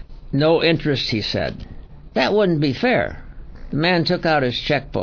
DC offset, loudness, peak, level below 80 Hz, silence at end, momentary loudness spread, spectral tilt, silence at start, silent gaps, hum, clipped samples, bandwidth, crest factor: under 0.1%; -19 LUFS; -4 dBFS; -38 dBFS; 0 s; 11 LU; -6.5 dB/octave; 0 s; none; none; under 0.1%; 5.4 kHz; 16 dB